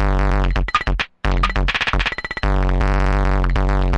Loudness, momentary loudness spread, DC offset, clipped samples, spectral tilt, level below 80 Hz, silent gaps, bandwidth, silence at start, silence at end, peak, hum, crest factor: -20 LUFS; 3 LU; under 0.1%; under 0.1%; -6 dB/octave; -18 dBFS; none; 7.6 kHz; 0 s; 0 s; -4 dBFS; none; 12 dB